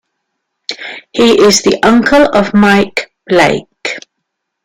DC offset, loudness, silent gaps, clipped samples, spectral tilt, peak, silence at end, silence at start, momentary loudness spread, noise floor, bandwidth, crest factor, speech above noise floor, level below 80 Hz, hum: under 0.1%; -10 LUFS; none; under 0.1%; -4 dB/octave; 0 dBFS; 0.65 s; 0.7 s; 16 LU; -72 dBFS; 16.5 kHz; 12 dB; 63 dB; -42 dBFS; none